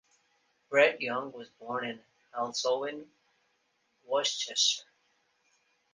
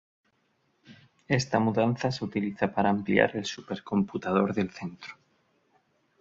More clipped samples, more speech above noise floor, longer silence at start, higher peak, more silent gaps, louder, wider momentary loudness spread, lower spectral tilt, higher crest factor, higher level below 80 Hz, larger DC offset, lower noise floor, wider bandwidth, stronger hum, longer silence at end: neither; about the same, 44 dB vs 44 dB; second, 0.7 s vs 0.9 s; second, -12 dBFS vs -6 dBFS; neither; about the same, -30 LUFS vs -28 LUFS; first, 18 LU vs 13 LU; second, -1 dB/octave vs -6 dB/octave; about the same, 22 dB vs 24 dB; second, -82 dBFS vs -62 dBFS; neither; about the same, -75 dBFS vs -72 dBFS; first, 10 kHz vs 7.8 kHz; neither; about the same, 1.1 s vs 1.05 s